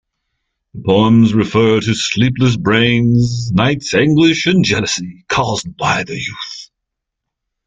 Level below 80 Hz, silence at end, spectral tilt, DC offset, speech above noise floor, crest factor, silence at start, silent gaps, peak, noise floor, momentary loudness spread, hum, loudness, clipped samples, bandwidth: -44 dBFS; 1 s; -5.5 dB/octave; under 0.1%; 65 dB; 14 dB; 0.75 s; none; 0 dBFS; -78 dBFS; 11 LU; none; -14 LUFS; under 0.1%; 9.4 kHz